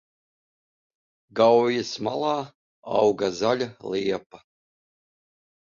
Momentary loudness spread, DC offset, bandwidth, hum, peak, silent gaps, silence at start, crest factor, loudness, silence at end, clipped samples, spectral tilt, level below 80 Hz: 12 LU; under 0.1%; 7.4 kHz; none; -6 dBFS; 2.55-2.83 s, 4.26-4.30 s; 1.35 s; 20 dB; -24 LUFS; 1.3 s; under 0.1%; -5 dB/octave; -66 dBFS